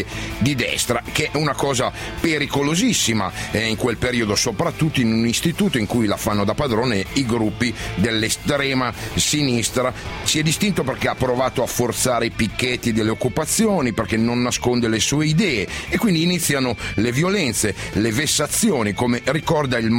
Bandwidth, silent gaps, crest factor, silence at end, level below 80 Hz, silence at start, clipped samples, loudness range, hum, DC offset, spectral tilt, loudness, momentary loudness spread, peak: 16.5 kHz; none; 18 dB; 0 s; -40 dBFS; 0 s; under 0.1%; 1 LU; none; under 0.1%; -4 dB/octave; -20 LUFS; 4 LU; -2 dBFS